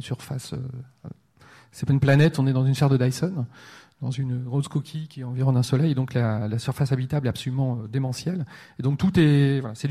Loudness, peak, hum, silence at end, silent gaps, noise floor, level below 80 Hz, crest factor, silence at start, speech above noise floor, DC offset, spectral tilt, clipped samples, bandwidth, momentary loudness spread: -24 LUFS; -6 dBFS; none; 0 s; none; -53 dBFS; -54 dBFS; 16 dB; 0 s; 30 dB; under 0.1%; -7 dB/octave; under 0.1%; 13 kHz; 15 LU